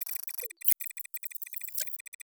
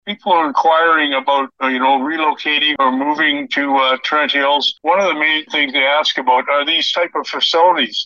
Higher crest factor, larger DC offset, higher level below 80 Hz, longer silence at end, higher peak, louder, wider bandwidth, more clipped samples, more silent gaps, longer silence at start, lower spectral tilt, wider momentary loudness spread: first, 28 dB vs 14 dB; neither; second, under -90 dBFS vs -72 dBFS; first, 0.3 s vs 0 s; second, -6 dBFS vs -2 dBFS; second, -32 LUFS vs -14 LUFS; first, over 20 kHz vs 7.4 kHz; neither; neither; about the same, 0 s vs 0.05 s; second, 7 dB/octave vs -2.5 dB/octave; first, 10 LU vs 4 LU